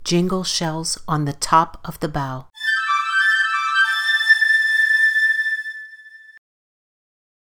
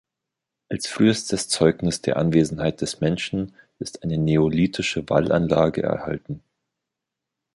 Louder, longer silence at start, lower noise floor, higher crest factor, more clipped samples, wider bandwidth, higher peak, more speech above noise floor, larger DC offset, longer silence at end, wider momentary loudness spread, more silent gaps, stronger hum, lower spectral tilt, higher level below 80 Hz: first, -17 LUFS vs -22 LUFS; second, 0 s vs 0.7 s; second, -43 dBFS vs -85 dBFS; about the same, 18 dB vs 20 dB; neither; first, 18 kHz vs 11.5 kHz; about the same, -2 dBFS vs -2 dBFS; second, 22 dB vs 63 dB; neither; about the same, 1.1 s vs 1.15 s; about the same, 12 LU vs 12 LU; neither; neither; second, -3 dB/octave vs -5.5 dB/octave; about the same, -48 dBFS vs -48 dBFS